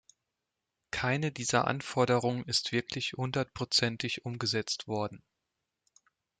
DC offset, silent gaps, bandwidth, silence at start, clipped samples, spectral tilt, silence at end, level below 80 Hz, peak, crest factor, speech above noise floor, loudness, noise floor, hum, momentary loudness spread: under 0.1%; none; 9.6 kHz; 0.95 s; under 0.1%; -4 dB/octave; 1.25 s; -66 dBFS; -12 dBFS; 20 dB; 55 dB; -31 LUFS; -87 dBFS; none; 7 LU